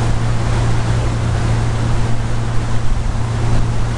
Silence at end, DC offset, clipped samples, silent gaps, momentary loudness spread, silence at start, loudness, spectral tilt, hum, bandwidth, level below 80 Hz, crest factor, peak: 0 s; under 0.1%; under 0.1%; none; 3 LU; 0 s; -19 LUFS; -6.5 dB/octave; none; 11 kHz; -20 dBFS; 12 dB; -2 dBFS